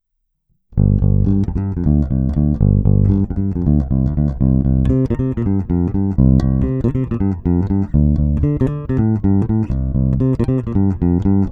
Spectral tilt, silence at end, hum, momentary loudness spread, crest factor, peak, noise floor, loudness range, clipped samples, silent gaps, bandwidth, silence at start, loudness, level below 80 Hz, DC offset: -12 dB/octave; 0 s; none; 5 LU; 14 dB; -2 dBFS; -69 dBFS; 1 LU; under 0.1%; none; 4.7 kHz; 0.7 s; -17 LUFS; -22 dBFS; under 0.1%